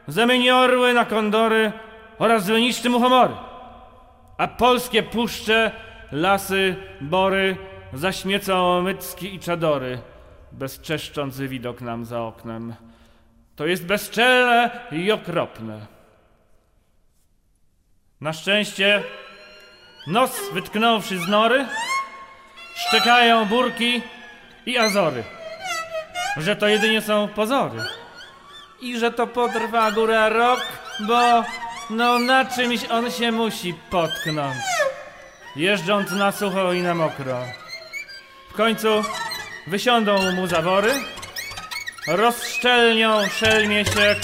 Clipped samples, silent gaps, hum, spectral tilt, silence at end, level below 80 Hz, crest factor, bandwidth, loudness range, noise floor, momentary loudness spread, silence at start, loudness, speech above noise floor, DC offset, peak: under 0.1%; none; none; -4 dB/octave; 0 s; -54 dBFS; 18 dB; 16 kHz; 6 LU; -61 dBFS; 16 LU; 0.05 s; -20 LUFS; 41 dB; under 0.1%; -4 dBFS